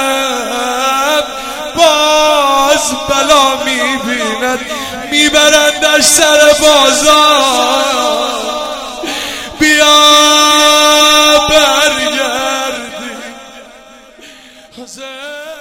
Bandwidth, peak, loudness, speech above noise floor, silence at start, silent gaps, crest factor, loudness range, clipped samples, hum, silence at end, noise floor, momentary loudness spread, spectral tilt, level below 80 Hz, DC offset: 19 kHz; 0 dBFS; -8 LUFS; 28 dB; 0 s; none; 10 dB; 7 LU; 0.7%; none; 0 s; -37 dBFS; 15 LU; -0.5 dB/octave; -40 dBFS; under 0.1%